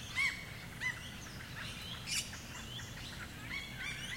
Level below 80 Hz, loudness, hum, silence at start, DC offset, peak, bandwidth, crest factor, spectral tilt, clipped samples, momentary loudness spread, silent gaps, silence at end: -58 dBFS; -41 LUFS; none; 0 s; under 0.1%; -22 dBFS; 16.5 kHz; 20 dB; -2 dB/octave; under 0.1%; 11 LU; none; 0 s